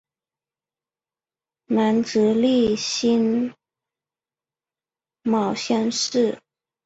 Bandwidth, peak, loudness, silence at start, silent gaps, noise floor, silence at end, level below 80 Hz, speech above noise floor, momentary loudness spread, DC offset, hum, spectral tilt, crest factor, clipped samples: 8 kHz; -8 dBFS; -21 LUFS; 1.7 s; none; under -90 dBFS; 0.5 s; -62 dBFS; over 70 dB; 7 LU; under 0.1%; none; -4.5 dB/octave; 16 dB; under 0.1%